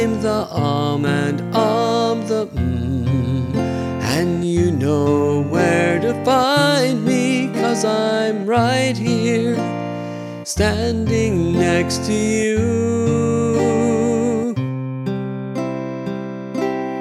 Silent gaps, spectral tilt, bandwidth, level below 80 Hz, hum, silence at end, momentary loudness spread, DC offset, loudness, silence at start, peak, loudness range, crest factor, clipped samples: none; -6 dB/octave; 14.5 kHz; -40 dBFS; none; 0 s; 8 LU; under 0.1%; -19 LUFS; 0 s; -2 dBFS; 3 LU; 16 dB; under 0.1%